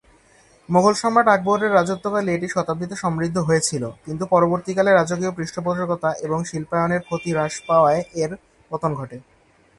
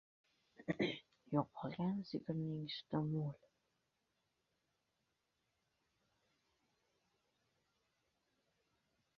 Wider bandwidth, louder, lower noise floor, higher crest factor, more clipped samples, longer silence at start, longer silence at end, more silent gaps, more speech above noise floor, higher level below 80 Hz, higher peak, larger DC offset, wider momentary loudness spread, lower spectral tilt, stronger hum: first, 11.5 kHz vs 7 kHz; first, -21 LUFS vs -43 LUFS; second, -54 dBFS vs -86 dBFS; second, 20 dB vs 26 dB; neither; about the same, 0.7 s vs 0.6 s; second, 0.55 s vs 5.8 s; neither; second, 34 dB vs 44 dB; first, -56 dBFS vs -80 dBFS; first, -2 dBFS vs -22 dBFS; neither; first, 10 LU vs 7 LU; about the same, -5.5 dB/octave vs -6 dB/octave; neither